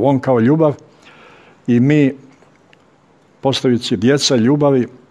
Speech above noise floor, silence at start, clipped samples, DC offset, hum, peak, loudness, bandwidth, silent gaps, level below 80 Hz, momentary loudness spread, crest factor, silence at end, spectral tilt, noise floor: 38 dB; 0 s; under 0.1%; under 0.1%; none; 0 dBFS; -14 LUFS; 11.5 kHz; none; -58 dBFS; 8 LU; 16 dB; 0.2 s; -6 dB/octave; -51 dBFS